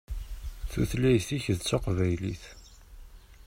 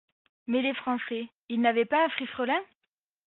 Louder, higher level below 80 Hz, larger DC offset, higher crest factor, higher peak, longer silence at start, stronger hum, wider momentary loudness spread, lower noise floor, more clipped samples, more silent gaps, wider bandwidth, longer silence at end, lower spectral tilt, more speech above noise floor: about the same, -29 LUFS vs -28 LUFS; first, -40 dBFS vs -76 dBFS; neither; about the same, 18 dB vs 20 dB; about the same, -12 dBFS vs -10 dBFS; second, 0.1 s vs 0.5 s; neither; first, 17 LU vs 10 LU; second, -49 dBFS vs -84 dBFS; neither; second, none vs 1.37-1.48 s; first, 16 kHz vs 4.2 kHz; second, 0.05 s vs 0.6 s; first, -6 dB/octave vs -1.5 dB/octave; second, 21 dB vs 56 dB